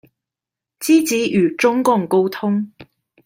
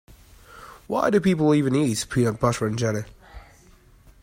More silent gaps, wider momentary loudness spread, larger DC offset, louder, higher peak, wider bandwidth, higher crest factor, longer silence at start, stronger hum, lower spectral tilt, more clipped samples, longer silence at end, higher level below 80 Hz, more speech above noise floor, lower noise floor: neither; second, 8 LU vs 16 LU; neither; first, -17 LUFS vs -22 LUFS; first, -2 dBFS vs -6 dBFS; about the same, 16.5 kHz vs 16 kHz; about the same, 16 dB vs 18 dB; first, 0.8 s vs 0.5 s; neither; about the same, -5 dB/octave vs -6 dB/octave; neither; second, 0.4 s vs 0.8 s; second, -64 dBFS vs -50 dBFS; first, 71 dB vs 31 dB; first, -87 dBFS vs -53 dBFS